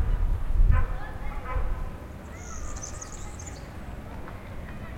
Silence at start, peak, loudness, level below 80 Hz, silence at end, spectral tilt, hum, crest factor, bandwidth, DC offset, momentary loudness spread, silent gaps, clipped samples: 0 s; -8 dBFS; -34 LUFS; -28 dBFS; 0 s; -5.5 dB/octave; none; 20 dB; 9.6 kHz; under 0.1%; 14 LU; none; under 0.1%